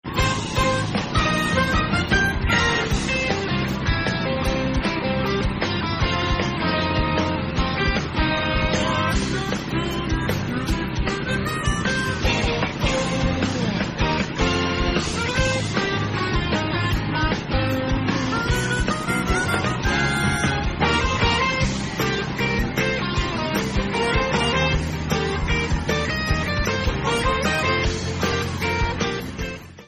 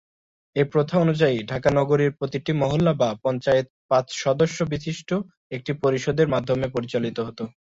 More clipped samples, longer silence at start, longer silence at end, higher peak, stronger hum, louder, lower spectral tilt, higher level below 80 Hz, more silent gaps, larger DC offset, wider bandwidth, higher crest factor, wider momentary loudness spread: neither; second, 0.05 s vs 0.55 s; second, 0 s vs 0.15 s; about the same, -8 dBFS vs -6 dBFS; neither; about the same, -22 LUFS vs -23 LUFS; second, -5 dB/octave vs -6.5 dB/octave; first, -30 dBFS vs -54 dBFS; second, none vs 3.70-3.89 s, 5.37-5.50 s; neither; first, 13.5 kHz vs 7.8 kHz; about the same, 14 dB vs 18 dB; second, 4 LU vs 8 LU